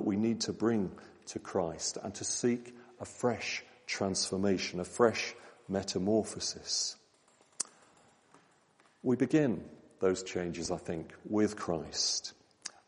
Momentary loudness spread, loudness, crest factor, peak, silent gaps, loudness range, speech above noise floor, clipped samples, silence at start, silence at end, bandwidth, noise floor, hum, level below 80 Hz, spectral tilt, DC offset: 14 LU; -33 LUFS; 22 dB; -12 dBFS; none; 3 LU; 34 dB; under 0.1%; 0 s; 0.15 s; 11 kHz; -67 dBFS; none; -70 dBFS; -4 dB/octave; under 0.1%